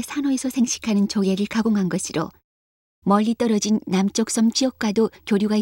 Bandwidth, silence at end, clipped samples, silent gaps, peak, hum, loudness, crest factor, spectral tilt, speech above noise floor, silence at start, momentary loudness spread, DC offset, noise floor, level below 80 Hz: 16.5 kHz; 0 s; under 0.1%; 2.44-3.02 s; -6 dBFS; none; -21 LUFS; 14 dB; -5 dB/octave; over 69 dB; 0 s; 4 LU; under 0.1%; under -90 dBFS; -58 dBFS